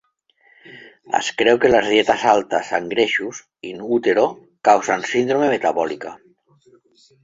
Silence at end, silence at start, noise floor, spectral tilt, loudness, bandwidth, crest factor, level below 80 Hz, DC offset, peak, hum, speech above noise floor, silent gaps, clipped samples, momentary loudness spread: 1.05 s; 0.7 s; -59 dBFS; -3.5 dB/octave; -18 LUFS; 7.8 kHz; 18 dB; -58 dBFS; under 0.1%; -2 dBFS; none; 41 dB; none; under 0.1%; 15 LU